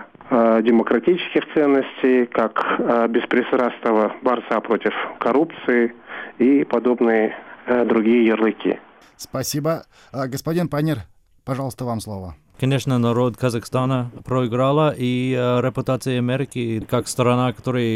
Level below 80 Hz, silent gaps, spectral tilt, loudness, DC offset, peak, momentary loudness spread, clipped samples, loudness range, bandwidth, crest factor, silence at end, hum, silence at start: -54 dBFS; none; -6.5 dB/octave; -20 LUFS; under 0.1%; -6 dBFS; 10 LU; under 0.1%; 6 LU; 16 kHz; 14 dB; 0 s; none; 0 s